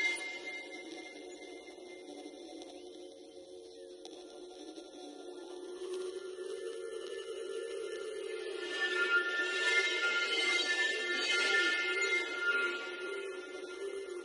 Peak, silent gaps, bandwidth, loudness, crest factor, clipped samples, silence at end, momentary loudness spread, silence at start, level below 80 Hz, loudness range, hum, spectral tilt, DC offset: -18 dBFS; none; 11.5 kHz; -34 LUFS; 18 dB; under 0.1%; 0 s; 20 LU; 0 s; -82 dBFS; 19 LU; none; 0.5 dB/octave; under 0.1%